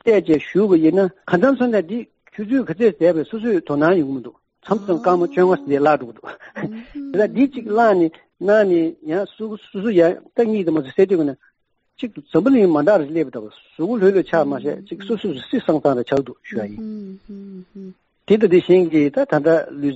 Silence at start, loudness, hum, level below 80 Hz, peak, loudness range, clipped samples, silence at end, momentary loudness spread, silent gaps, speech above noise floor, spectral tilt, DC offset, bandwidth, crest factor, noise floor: 0.05 s; -18 LUFS; none; -60 dBFS; -2 dBFS; 2 LU; under 0.1%; 0 s; 17 LU; none; 48 dB; -6 dB/octave; under 0.1%; 7.8 kHz; 16 dB; -66 dBFS